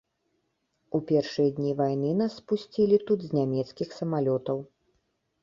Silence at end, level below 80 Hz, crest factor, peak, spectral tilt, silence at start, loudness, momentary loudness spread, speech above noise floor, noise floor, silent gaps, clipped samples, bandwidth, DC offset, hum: 0.8 s; -68 dBFS; 18 dB; -10 dBFS; -8 dB/octave; 0.95 s; -27 LUFS; 9 LU; 49 dB; -76 dBFS; none; under 0.1%; 7.4 kHz; under 0.1%; none